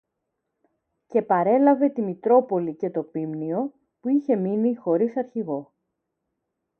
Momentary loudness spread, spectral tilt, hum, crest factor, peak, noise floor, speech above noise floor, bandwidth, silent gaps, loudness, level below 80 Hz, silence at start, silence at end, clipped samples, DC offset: 11 LU; -11 dB/octave; none; 18 dB; -6 dBFS; -80 dBFS; 58 dB; 3.3 kHz; none; -23 LUFS; -76 dBFS; 1.1 s; 1.15 s; under 0.1%; under 0.1%